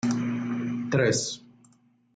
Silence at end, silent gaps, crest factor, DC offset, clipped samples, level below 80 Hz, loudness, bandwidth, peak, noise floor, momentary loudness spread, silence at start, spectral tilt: 0.75 s; none; 18 dB; under 0.1%; under 0.1%; -66 dBFS; -27 LUFS; 9.4 kHz; -12 dBFS; -62 dBFS; 9 LU; 0.05 s; -4.5 dB/octave